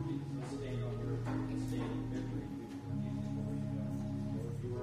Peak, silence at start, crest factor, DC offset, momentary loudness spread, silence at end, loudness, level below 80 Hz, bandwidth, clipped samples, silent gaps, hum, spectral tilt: -26 dBFS; 0 s; 12 dB; under 0.1%; 3 LU; 0 s; -40 LUFS; -54 dBFS; 13 kHz; under 0.1%; none; none; -8 dB/octave